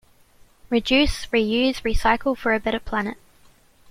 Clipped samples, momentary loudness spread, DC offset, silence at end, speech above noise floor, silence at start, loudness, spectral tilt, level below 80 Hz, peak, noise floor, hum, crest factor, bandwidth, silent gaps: under 0.1%; 7 LU; under 0.1%; 0.75 s; 33 dB; 0.7 s; -22 LUFS; -4.5 dB/octave; -34 dBFS; -6 dBFS; -54 dBFS; none; 18 dB; 16 kHz; none